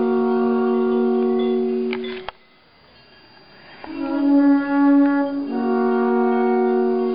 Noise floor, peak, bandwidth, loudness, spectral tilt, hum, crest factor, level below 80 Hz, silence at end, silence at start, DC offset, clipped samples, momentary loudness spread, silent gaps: -53 dBFS; -8 dBFS; 5.2 kHz; -19 LUFS; -10.5 dB/octave; none; 12 dB; -60 dBFS; 0 s; 0 s; 0.3%; under 0.1%; 13 LU; none